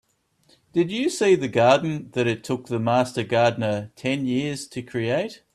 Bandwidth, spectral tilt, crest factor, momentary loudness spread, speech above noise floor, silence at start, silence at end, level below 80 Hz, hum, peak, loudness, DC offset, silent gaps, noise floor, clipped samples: 13 kHz; -5.5 dB/octave; 20 dB; 10 LU; 41 dB; 0.75 s; 0.2 s; -62 dBFS; none; -4 dBFS; -23 LUFS; under 0.1%; none; -63 dBFS; under 0.1%